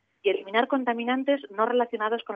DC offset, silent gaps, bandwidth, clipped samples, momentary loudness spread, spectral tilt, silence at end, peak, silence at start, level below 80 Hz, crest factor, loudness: under 0.1%; none; 4.9 kHz; under 0.1%; 3 LU; -6.5 dB/octave; 0 s; -12 dBFS; 0.25 s; -84 dBFS; 16 dB; -26 LUFS